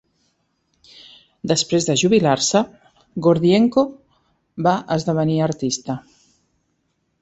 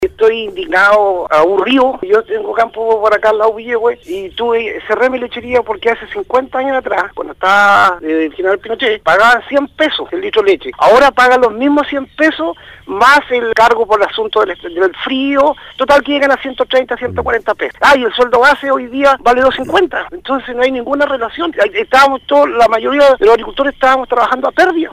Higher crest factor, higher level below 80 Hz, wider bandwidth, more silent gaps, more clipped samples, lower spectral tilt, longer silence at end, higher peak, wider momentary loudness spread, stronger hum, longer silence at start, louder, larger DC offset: first, 18 dB vs 10 dB; second, -56 dBFS vs -42 dBFS; second, 8.2 kHz vs 15.5 kHz; neither; neither; about the same, -5 dB/octave vs -4 dB/octave; first, 1.2 s vs 0 s; about the same, -2 dBFS vs -2 dBFS; first, 14 LU vs 9 LU; neither; first, 1.45 s vs 0 s; second, -19 LUFS vs -12 LUFS; neither